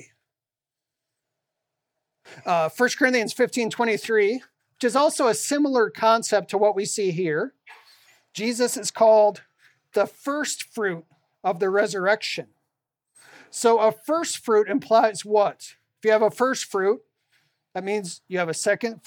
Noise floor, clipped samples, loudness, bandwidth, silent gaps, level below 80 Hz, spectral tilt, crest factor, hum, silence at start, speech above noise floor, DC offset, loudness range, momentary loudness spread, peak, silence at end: -89 dBFS; under 0.1%; -23 LUFS; 18 kHz; none; -82 dBFS; -3.5 dB/octave; 20 dB; none; 2.3 s; 67 dB; under 0.1%; 4 LU; 10 LU; -4 dBFS; 0.1 s